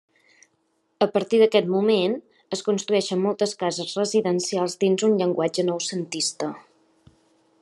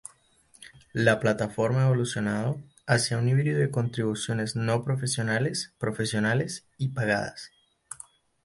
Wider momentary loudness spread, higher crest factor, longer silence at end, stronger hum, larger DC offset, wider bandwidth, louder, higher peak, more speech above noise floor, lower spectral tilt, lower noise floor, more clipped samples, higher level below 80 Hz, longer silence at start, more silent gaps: second, 9 LU vs 16 LU; about the same, 20 dB vs 20 dB; first, 1.05 s vs 0.5 s; neither; neither; about the same, 12 kHz vs 11.5 kHz; first, -23 LUFS vs -27 LUFS; about the same, -4 dBFS vs -6 dBFS; first, 47 dB vs 35 dB; about the same, -4.5 dB/octave vs -5.5 dB/octave; first, -70 dBFS vs -61 dBFS; neither; second, -76 dBFS vs -60 dBFS; first, 1 s vs 0.6 s; neither